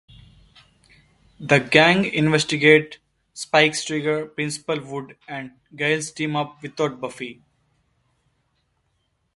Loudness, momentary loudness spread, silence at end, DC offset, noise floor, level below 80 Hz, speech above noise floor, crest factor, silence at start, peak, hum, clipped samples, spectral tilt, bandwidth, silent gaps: -20 LUFS; 20 LU; 2.05 s; under 0.1%; -70 dBFS; -60 dBFS; 49 dB; 24 dB; 1.4 s; 0 dBFS; none; under 0.1%; -4.5 dB/octave; 11.5 kHz; none